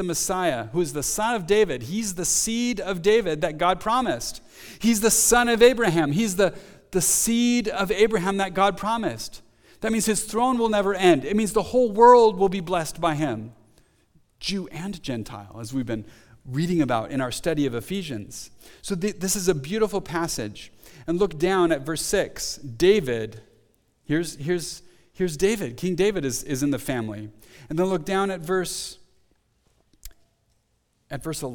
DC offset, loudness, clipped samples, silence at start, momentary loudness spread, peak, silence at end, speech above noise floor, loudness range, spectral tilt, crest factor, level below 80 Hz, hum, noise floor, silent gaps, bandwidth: under 0.1%; -23 LUFS; under 0.1%; 0 s; 14 LU; -2 dBFS; 0 s; 46 dB; 9 LU; -4 dB/octave; 22 dB; -48 dBFS; none; -69 dBFS; none; 19.5 kHz